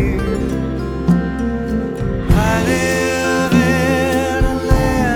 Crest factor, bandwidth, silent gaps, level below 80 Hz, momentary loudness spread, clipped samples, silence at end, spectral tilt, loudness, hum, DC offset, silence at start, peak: 14 dB; 19 kHz; none; -24 dBFS; 7 LU; under 0.1%; 0 s; -6 dB/octave; -16 LUFS; none; under 0.1%; 0 s; 0 dBFS